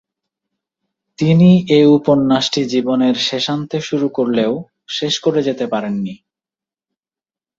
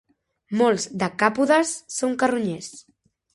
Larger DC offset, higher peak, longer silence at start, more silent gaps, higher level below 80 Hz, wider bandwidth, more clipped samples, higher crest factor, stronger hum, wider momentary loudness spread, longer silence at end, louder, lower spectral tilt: neither; about the same, -2 dBFS vs -2 dBFS; first, 1.2 s vs 0.5 s; neither; first, -58 dBFS vs -66 dBFS; second, 7.8 kHz vs 11.5 kHz; neither; second, 14 dB vs 20 dB; neither; about the same, 11 LU vs 10 LU; first, 1.45 s vs 0.55 s; first, -15 LUFS vs -22 LUFS; first, -6 dB/octave vs -4 dB/octave